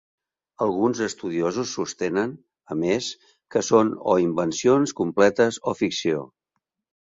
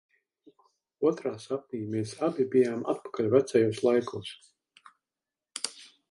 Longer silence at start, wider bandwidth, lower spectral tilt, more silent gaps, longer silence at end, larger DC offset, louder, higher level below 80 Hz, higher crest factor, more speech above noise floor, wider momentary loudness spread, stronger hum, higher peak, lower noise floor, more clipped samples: second, 0.6 s vs 1 s; second, 7.8 kHz vs 11.5 kHz; about the same, -4.5 dB/octave vs -5.5 dB/octave; neither; first, 0.8 s vs 0.25 s; neither; first, -23 LUFS vs -29 LUFS; first, -62 dBFS vs -72 dBFS; about the same, 20 dB vs 22 dB; second, 57 dB vs over 62 dB; second, 9 LU vs 13 LU; neither; first, -4 dBFS vs -8 dBFS; second, -80 dBFS vs under -90 dBFS; neither